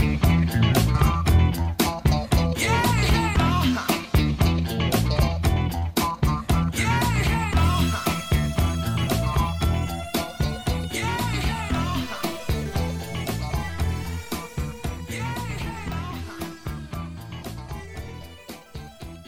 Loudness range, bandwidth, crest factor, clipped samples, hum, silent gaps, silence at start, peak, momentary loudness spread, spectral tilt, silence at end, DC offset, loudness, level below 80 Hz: 11 LU; 17 kHz; 18 dB; under 0.1%; none; none; 0 s; -6 dBFS; 15 LU; -5.5 dB/octave; 0 s; under 0.1%; -24 LUFS; -30 dBFS